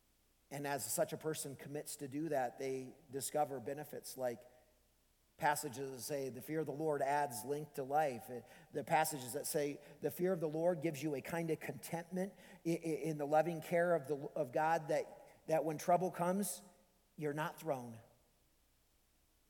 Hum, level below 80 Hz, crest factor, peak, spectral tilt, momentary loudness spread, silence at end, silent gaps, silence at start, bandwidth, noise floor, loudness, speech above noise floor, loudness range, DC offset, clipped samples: none; -78 dBFS; 20 dB; -20 dBFS; -5 dB/octave; 11 LU; 1.5 s; none; 0.5 s; 19 kHz; -75 dBFS; -40 LUFS; 36 dB; 5 LU; under 0.1%; under 0.1%